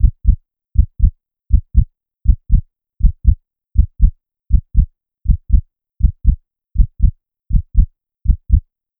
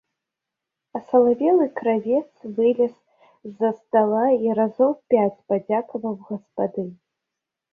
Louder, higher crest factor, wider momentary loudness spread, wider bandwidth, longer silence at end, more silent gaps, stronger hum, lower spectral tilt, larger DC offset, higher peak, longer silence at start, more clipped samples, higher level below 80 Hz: first, -19 LUFS vs -22 LUFS; about the same, 14 dB vs 18 dB; second, 7 LU vs 14 LU; second, 0.5 kHz vs 3.4 kHz; second, 0.4 s vs 0.8 s; neither; neither; first, -17.5 dB/octave vs -10 dB/octave; neither; first, 0 dBFS vs -4 dBFS; second, 0 s vs 0.95 s; neither; first, -16 dBFS vs -70 dBFS